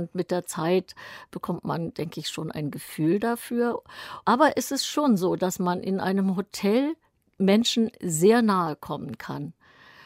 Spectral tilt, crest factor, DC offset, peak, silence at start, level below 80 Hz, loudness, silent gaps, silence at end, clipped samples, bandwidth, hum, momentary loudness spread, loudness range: -5 dB/octave; 20 dB; under 0.1%; -6 dBFS; 0 s; -66 dBFS; -25 LUFS; none; 0.55 s; under 0.1%; 16 kHz; none; 14 LU; 5 LU